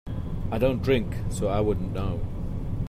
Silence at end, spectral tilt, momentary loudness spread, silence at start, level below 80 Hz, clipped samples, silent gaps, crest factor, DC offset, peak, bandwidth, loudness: 0 s; -7 dB/octave; 8 LU; 0.05 s; -34 dBFS; under 0.1%; none; 16 dB; under 0.1%; -10 dBFS; 15 kHz; -28 LUFS